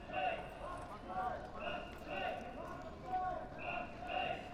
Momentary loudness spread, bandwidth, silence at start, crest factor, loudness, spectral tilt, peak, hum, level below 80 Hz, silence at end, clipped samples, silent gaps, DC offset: 8 LU; 14.5 kHz; 0 s; 16 dB; -43 LUFS; -5.5 dB/octave; -26 dBFS; none; -58 dBFS; 0 s; under 0.1%; none; under 0.1%